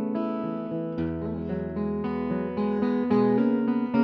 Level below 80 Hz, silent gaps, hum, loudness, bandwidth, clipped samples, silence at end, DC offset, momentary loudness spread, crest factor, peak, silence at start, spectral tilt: -52 dBFS; none; none; -27 LUFS; 5.2 kHz; under 0.1%; 0 s; under 0.1%; 8 LU; 14 dB; -12 dBFS; 0 s; -10.5 dB/octave